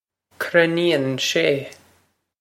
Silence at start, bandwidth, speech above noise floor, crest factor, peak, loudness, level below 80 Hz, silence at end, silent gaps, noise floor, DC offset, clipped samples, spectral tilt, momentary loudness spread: 0.4 s; 16.5 kHz; 44 dB; 22 dB; 0 dBFS; -20 LUFS; -70 dBFS; 0.65 s; none; -63 dBFS; under 0.1%; under 0.1%; -4 dB/octave; 11 LU